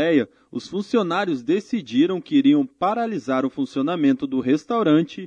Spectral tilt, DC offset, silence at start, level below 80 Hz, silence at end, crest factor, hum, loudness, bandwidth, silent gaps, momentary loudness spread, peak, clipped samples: -6.5 dB/octave; under 0.1%; 0 s; -68 dBFS; 0 s; 14 dB; none; -21 LUFS; 7.6 kHz; none; 6 LU; -6 dBFS; under 0.1%